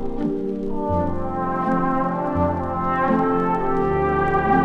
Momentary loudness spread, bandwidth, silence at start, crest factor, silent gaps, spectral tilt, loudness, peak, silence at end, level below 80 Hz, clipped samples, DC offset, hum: 6 LU; 6.4 kHz; 0 s; 16 dB; none; -9.5 dB/octave; -22 LUFS; -6 dBFS; 0 s; -34 dBFS; under 0.1%; under 0.1%; none